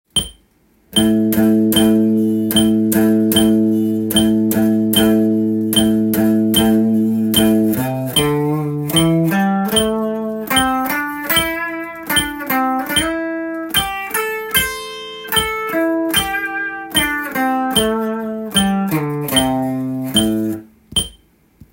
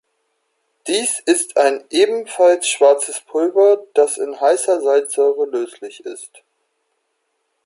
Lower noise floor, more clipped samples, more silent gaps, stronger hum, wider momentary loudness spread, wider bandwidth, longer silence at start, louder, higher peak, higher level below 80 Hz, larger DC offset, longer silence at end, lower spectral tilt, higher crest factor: second, -55 dBFS vs -70 dBFS; neither; neither; neither; second, 8 LU vs 16 LU; first, 17 kHz vs 11.5 kHz; second, 0.15 s vs 0.85 s; about the same, -16 LUFS vs -16 LUFS; about the same, 0 dBFS vs -2 dBFS; first, -42 dBFS vs -76 dBFS; neither; second, 0.6 s vs 1.4 s; first, -4 dB/octave vs -1 dB/octave; about the same, 16 dB vs 16 dB